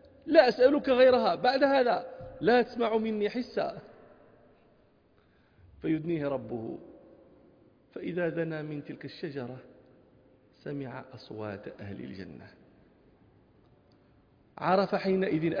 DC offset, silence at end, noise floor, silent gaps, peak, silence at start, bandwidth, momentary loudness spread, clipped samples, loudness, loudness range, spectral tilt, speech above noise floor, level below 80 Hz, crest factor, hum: under 0.1%; 0 s; -64 dBFS; none; -8 dBFS; 0.25 s; 5.2 kHz; 21 LU; under 0.1%; -28 LUFS; 17 LU; -7.5 dB/octave; 36 dB; -66 dBFS; 22 dB; none